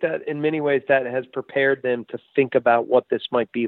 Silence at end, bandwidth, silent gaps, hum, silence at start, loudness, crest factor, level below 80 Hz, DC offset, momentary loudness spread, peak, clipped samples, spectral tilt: 0 s; 4.3 kHz; none; none; 0 s; -22 LUFS; 16 dB; -70 dBFS; under 0.1%; 8 LU; -4 dBFS; under 0.1%; -9.5 dB/octave